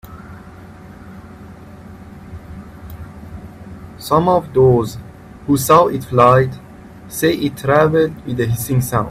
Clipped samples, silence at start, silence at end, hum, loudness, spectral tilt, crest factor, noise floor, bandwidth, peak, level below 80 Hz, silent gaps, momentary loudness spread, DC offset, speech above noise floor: under 0.1%; 0.05 s; 0 s; none; -15 LUFS; -6 dB/octave; 18 dB; -37 dBFS; 16 kHz; 0 dBFS; -42 dBFS; none; 25 LU; under 0.1%; 23 dB